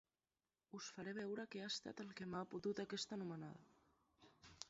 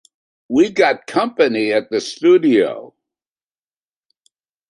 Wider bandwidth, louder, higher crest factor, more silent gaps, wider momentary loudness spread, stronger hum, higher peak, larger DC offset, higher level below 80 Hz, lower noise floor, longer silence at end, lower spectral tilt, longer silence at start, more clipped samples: second, 7.6 kHz vs 11 kHz; second, -49 LUFS vs -16 LUFS; first, 24 dB vs 16 dB; neither; first, 13 LU vs 9 LU; neither; second, -28 dBFS vs -2 dBFS; neither; second, -82 dBFS vs -64 dBFS; about the same, under -90 dBFS vs under -90 dBFS; second, 0 s vs 1.8 s; about the same, -4 dB/octave vs -5 dB/octave; first, 0.75 s vs 0.5 s; neither